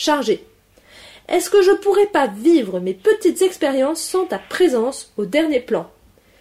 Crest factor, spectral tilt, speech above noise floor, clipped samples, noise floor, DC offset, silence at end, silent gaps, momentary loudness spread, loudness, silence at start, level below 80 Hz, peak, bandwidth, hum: 14 dB; -4 dB/octave; 31 dB; under 0.1%; -48 dBFS; under 0.1%; 0.55 s; none; 9 LU; -18 LUFS; 0 s; -58 dBFS; -4 dBFS; 16 kHz; none